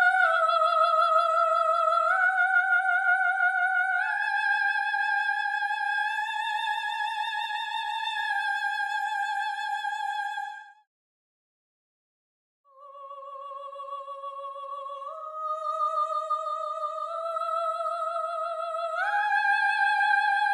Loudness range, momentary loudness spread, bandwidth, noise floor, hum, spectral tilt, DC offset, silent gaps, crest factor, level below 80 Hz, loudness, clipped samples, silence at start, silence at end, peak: 17 LU; 15 LU; 12.5 kHz; under -90 dBFS; none; 5 dB/octave; under 0.1%; 10.87-12.64 s; 16 dB; under -90 dBFS; -26 LUFS; under 0.1%; 0 s; 0 s; -10 dBFS